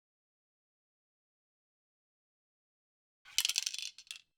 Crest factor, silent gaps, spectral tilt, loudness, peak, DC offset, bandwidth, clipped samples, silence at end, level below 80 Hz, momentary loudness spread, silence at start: 36 dB; none; 6 dB/octave; -34 LUFS; -8 dBFS; under 0.1%; over 20 kHz; under 0.1%; 0.2 s; -88 dBFS; 13 LU; 3.25 s